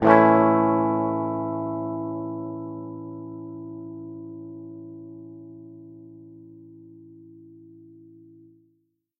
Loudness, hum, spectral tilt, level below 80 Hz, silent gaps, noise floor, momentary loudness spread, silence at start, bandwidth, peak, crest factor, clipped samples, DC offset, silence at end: -24 LUFS; none; -10 dB/octave; -66 dBFS; none; -70 dBFS; 27 LU; 0 s; 5 kHz; 0 dBFS; 26 dB; under 0.1%; under 0.1%; 1.35 s